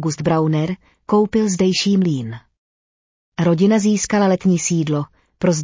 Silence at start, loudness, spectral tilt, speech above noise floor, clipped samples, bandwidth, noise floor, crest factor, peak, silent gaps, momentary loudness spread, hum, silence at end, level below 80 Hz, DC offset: 0 s; -18 LUFS; -5.5 dB/octave; over 73 dB; under 0.1%; 7.6 kHz; under -90 dBFS; 12 dB; -6 dBFS; 2.58-3.32 s; 12 LU; none; 0 s; -52 dBFS; under 0.1%